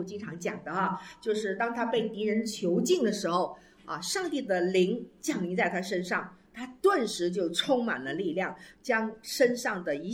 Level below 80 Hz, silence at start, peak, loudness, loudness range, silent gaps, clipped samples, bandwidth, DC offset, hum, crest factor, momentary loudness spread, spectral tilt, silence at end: -70 dBFS; 0 s; -12 dBFS; -30 LUFS; 1 LU; none; under 0.1%; 16.5 kHz; under 0.1%; none; 18 dB; 9 LU; -4.5 dB/octave; 0 s